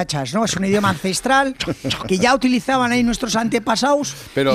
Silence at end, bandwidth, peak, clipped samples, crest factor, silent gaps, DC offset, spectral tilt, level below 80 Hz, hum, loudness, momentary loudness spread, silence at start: 0 s; 15 kHz; -4 dBFS; under 0.1%; 14 dB; none; under 0.1%; -4 dB/octave; -44 dBFS; none; -18 LUFS; 5 LU; 0 s